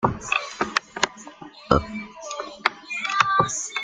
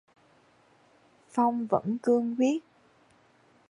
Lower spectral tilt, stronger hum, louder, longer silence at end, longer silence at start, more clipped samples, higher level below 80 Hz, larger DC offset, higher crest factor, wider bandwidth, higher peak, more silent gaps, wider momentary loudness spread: second, -3 dB/octave vs -7 dB/octave; neither; first, -24 LUFS vs -28 LUFS; second, 0 s vs 1.1 s; second, 0 s vs 1.35 s; neither; first, -44 dBFS vs -76 dBFS; neither; about the same, 26 dB vs 22 dB; second, 9.8 kHz vs 11 kHz; first, 0 dBFS vs -10 dBFS; neither; first, 15 LU vs 6 LU